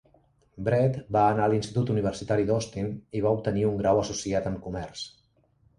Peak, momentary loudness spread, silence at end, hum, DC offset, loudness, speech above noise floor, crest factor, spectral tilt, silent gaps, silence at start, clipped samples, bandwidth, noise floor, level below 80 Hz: -10 dBFS; 11 LU; 0.7 s; none; under 0.1%; -27 LUFS; 39 dB; 18 dB; -6.5 dB/octave; none; 0.55 s; under 0.1%; 11 kHz; -65 dBFS; -52 dBFS